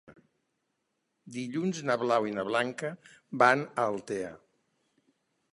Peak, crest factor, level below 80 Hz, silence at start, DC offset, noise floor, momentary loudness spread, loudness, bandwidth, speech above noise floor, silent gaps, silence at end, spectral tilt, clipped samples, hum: -6 dBFS; 26 dB; -76 dBFS; 0.1 s; under 0.1%; -80 dBFS; 17 LU; -29 LUFS; 11.5 kHz; 51 dB; none; 1.15 s; -5 dB/octave; under 0.1%; none